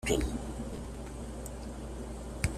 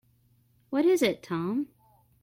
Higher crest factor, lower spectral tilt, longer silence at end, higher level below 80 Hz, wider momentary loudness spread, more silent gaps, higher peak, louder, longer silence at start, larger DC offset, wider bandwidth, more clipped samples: first, 24 dB vs 18 dB; about the same, -5 dB/octave vs -5.5 dB/octave; second, 0 s vs 0.6 s; first, -42 dBFS vs -70 dBFS; about the same, 10 LU vs 10 LU; neither; about the same, -12 dBFS vs -10 dBFS; second, -39 LUFS vs -27 LUFS; second, 0 s vs 0.7 s; neither; second, 14.5 kHz vs 16.5 kHz; neither